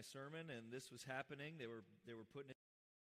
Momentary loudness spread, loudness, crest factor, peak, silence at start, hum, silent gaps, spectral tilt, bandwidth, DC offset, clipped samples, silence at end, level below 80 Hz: 9 LU; -54 LUFS; 20 dB; -36 dBFS; 0 s; none; none; -4.5 dB/octave; 15.5 kHz; under 0.1%; under 0.1%; 0.6 s; under -90 dBFS